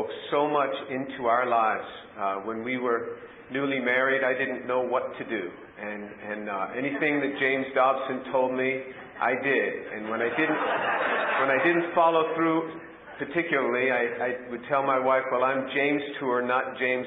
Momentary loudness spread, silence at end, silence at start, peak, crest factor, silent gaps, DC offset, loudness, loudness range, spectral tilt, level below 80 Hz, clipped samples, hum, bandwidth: 12 LU; 0 s; 0 s; -10 dBFS; 18 dB; none; under 0.1%; -26 LUFS; 3 LU; -8.5 dB/octave; -70 dBFS; under 0.1%; none; 4.5 kHz